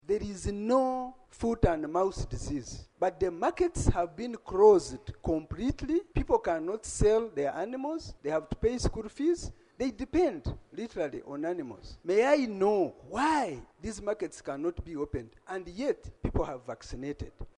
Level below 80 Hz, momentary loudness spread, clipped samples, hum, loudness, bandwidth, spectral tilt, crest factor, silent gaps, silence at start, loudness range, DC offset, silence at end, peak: -42 dBFS; 13 LU; under 0.1%; none; -31 LUFS; 11 kHz; -6 dB/octave; 22 dB; none; 0.1 s; 6 LU; under 0.1%; 0.1 s; -10 dBFS